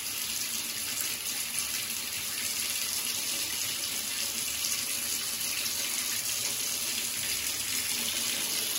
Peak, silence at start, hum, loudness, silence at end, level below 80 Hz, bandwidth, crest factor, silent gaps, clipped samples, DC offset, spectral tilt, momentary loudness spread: -12 dBFS; 0 s; none; -29 LUFS; 0 s; -64 dBFS; 16.5 kHz; 20 dB; none; under 0.1%; under 0.1%; 1 dB/octave; 2 LU